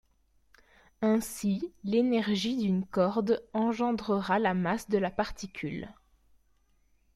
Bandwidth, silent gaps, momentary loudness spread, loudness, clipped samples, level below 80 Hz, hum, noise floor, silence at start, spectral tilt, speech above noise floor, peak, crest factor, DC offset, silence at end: 14.5 kHz; none; 10 LU; -30 LUFS; under 0.1%; -58 dBFS; none; -68 dBFS; 1 s; -6 dB/octave; 39 dB; -14 dBFS; 16 dB; under 0.1%; 1.25 s